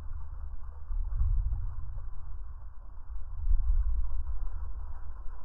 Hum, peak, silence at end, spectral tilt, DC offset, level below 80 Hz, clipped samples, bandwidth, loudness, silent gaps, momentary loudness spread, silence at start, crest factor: none; -14 dBFS; 0 s; -10.5 dB/octave; under 0.1%; -32 dBFS; under 0.1%; 1.7 kHz; -38 LUFS; none; 14 LU; 0 s; 16 dB